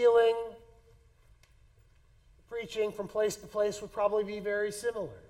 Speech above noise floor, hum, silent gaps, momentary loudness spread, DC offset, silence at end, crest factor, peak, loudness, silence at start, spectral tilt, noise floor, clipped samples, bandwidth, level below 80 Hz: 32 dB; none; none; 10 LU; under 0.1%; 0.1 s; 18 dB; -14 dBFS; -32 LUFS; 0 s; -4 dB/octave; -62 dBFS; under 0.1%; 15.5 kHz; -62 dBFS